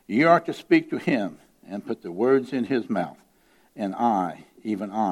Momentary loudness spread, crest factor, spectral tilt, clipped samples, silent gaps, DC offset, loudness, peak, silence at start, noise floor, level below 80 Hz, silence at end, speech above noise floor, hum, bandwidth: 14 LU; 20 dB; -7 dB/octave; under 0.1%; none; under 0.1%; -24 LUFS; -4 dBFS; 0.1 s; -59 dBFS; -72 dBFS; 0 s; 35 dB; none; 12.5 kHz